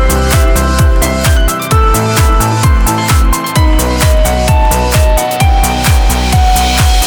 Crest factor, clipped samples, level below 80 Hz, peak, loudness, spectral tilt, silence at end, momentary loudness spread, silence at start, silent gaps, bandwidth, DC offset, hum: 8 dB; under 0.1%; -10 dBFS; 0 dBFS; -10 LUFS; -4.5 dB/octave; 0 s; 1 LU; 0 s; none; over 20 kHz; under 0.1%; none